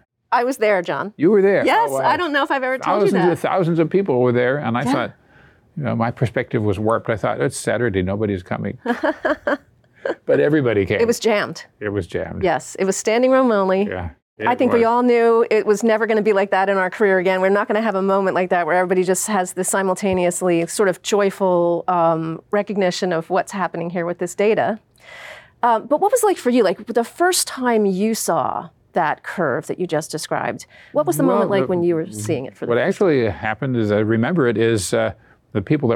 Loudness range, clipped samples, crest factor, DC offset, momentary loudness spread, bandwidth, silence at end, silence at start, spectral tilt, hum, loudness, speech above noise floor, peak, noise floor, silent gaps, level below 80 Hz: 4 LU; under 0.1%; 12 dB; under 0.1%; 9 LU; 18 kHz; 0 s; 0.3 s; -5 dB/octave; none; -19 LUFS; 33 dB; -6 dBFS; -51 dBFS; 14.22-14.36 s; -58 dBFS